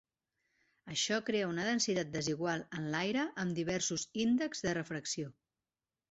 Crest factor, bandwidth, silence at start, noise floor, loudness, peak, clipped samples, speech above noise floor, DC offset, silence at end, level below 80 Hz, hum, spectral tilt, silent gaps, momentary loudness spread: 18 dB; 8 kHz; 0.85 s; under -90 dBFS; -35 LUFS; -20 dBFS; under 0.1%; over 55 dB; under 0.1%; 0.8 s; -70 dBFS; none; -3.5 dB/octave; none; 6 LU